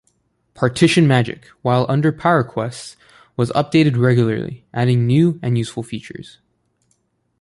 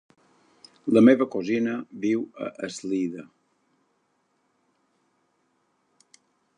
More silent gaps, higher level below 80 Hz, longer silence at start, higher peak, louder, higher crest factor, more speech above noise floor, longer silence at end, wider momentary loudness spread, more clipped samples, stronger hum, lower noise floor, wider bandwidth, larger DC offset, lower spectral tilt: neither; first, -52 dBFS vs -76 dBFS; second, 0.6 s vs 0.85 s; about the same, -2 dBFS vs -4 dBFS; first, -17 LUFS vs -24 LUFS; second, 16 dB vs 24 dB; about the same, 49 dB vs 48 dB; second, 1.2 s vs 3.35 s; about the same, 16 LU vs 17 LU; neither; neither; second, -66 dBFS vs -71 dBFS; first, 11.5 kHz vs 10 kHz; neither; about the same, -7 dB/octave vs -6.5 dB/octave